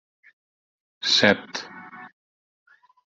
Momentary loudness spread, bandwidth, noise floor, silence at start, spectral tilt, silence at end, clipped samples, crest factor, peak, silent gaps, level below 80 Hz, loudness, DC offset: 25 LU; 8 kHz; under -90 dBFS; 1.05 s; -3 dB/octave; 1 s; under 0.1%; 26 dB; -2 dBFS; none; -68 dBFS; -20 LUFS; under 0.1%